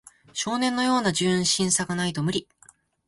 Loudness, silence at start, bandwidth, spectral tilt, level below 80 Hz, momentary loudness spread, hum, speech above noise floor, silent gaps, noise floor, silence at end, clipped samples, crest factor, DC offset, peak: -24 LUFS; 0.35 s; 11.5 kHz; -3.5 dB/octave; -60 dBFS; 8 LU; none; 33 dB; none; -57 dBFS; 0.65 s; under 0.1%; 16 dB; under 0.1%; -8 dBFS